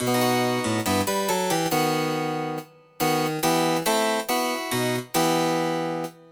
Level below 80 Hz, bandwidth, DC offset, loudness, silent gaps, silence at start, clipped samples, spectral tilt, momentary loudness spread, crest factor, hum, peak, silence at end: -62 dBFS; over 20 kHz; under 0.1%; -24 LUFS; none; 0 s; under 0.1%; -4 dB/octave; 6 LU; 16 dB; none; -8 dBFS; 0.2 s